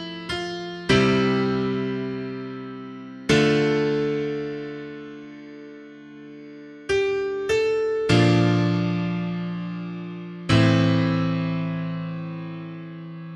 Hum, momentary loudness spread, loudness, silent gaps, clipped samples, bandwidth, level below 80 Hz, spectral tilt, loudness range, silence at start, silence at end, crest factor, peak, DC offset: none; 21 LU; -23 LUFS; none; under 0.1%; 11.5 kHz; -50 dBFS; -6.5 dB/octave; 6 LU; 0 s; 0 s; 18 dB; -6 dBFS; under 0.1%